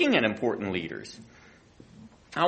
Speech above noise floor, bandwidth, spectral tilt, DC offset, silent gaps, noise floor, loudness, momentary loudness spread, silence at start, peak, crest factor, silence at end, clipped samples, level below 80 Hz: 26 dB; 8.4 kHz; -5.5 dB/octave; under 0.1%; none; -54 dBFS; -29 LUFS; 26 LU; 0 s; -8 dBFS; 20 dB; 0 s; under 0.1%; -64 dBFS